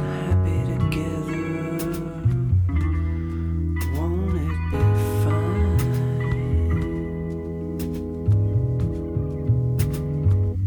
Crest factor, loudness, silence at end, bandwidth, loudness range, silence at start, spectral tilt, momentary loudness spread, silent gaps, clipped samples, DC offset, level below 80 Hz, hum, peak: 14 dB; -24 LUFS; 0 s; over 20 kHz; 2 LU; 0 s; -8 dB/octave; 7 LU; none; under 0.1%; under 0.1%; -30 dBFS; none; -8 dBFS